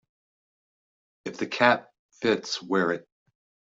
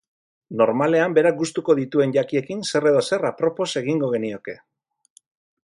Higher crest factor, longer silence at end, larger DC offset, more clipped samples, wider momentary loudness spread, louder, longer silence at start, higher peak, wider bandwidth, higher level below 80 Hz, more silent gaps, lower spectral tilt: first, 26 dB vs 18 dB; second, 0.75 s vs 1.1 s; neither; neither; about the same, 13 LU vs 11 LU; second, -26 LUFS vs -21 LUFS; first, 1.25 s vs 0.5 s; about the same, -4 dBFS vs -4 dBFS; second, 7.8 kHz vs 11.5 kHz; about the same, -72 dBFS vs -68 dBFS; first, 1.99-2.09 s vs none; second, -4 dB/octave vs -5.5 dB/octave